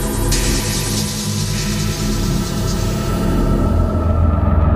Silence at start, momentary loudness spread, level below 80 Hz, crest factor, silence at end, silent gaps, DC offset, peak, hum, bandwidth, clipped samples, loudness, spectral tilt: 0 s; 4 LU; -22 dBFS; 12 dB; 0 s; none; under 0.1%; -4 dBFS; none; 16 kHz; under 0.1%; -18 LUFS; -5 dB/octave